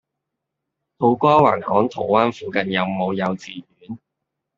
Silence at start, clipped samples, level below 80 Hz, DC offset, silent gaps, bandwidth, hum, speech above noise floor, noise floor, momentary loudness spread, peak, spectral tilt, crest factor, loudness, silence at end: 1 s; under 0.1%; -60 dBFS; under 0.1%; none; 7.6 kHz; none; 62 dB; -81 dBFS; 22 LU; -2 dBFS; -7 dB/octave; 20 dB; -19 LUFS; 0.6 s